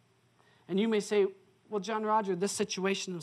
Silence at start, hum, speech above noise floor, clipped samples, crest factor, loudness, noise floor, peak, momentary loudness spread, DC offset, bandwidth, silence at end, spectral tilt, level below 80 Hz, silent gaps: 0.7 s; none; 36 dB; under 0.1%; 16 dB; -31 LUFS; -67 dBFS; -18 dBFS; 6 LU; under 0.1%; 13.5 kHz; 0 s; -4.5 dB/octave; -84 dBFS; none